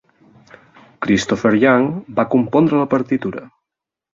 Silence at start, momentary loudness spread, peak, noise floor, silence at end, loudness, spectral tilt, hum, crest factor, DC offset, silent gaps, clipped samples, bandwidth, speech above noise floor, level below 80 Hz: 1 s; 10 LU; 0 dBFS; -84 dBFS; 0.7 s; -17 LUFS; -6.5 dB/octave; none; 18 dB; under 0.1%; none; under 0.1%; 7.8 kHz; 68 dB; -54 dBFS